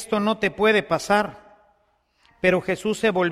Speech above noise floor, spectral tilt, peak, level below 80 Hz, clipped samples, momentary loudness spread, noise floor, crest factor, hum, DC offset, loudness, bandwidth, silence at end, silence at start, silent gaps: 44 dB; -5 dB/octave; -4 dBFS; -56 dBFS; under 0.1%; 4 LU; -66 dBFS; 18 dB; none; under 0.1%; -22 LUFS; 14.5 kHz; 0 s; 0 s; none